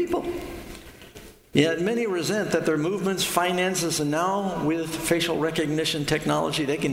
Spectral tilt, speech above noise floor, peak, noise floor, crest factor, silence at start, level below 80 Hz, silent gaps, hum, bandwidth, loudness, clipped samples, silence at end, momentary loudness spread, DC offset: -4 dB/octave; 22 dB; -4 dBFS; -46 dBFS; 20 dB; 0 s; -52 dBFS; none; none; 16.5 kHz; -24 LUFS; under 0.1%; 0 s; 14 LU; under 0.1%